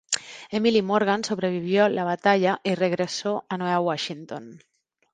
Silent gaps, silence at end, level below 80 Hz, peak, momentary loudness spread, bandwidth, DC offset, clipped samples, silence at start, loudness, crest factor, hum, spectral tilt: none; 0.55 s; -68 dBFS; -4 dBFS; 10 LU; 9.6 kHz; under 0.1%; under 0.1%; 0.1 s; -24 LUFS; 20 dB; none; -4.5 dB/octave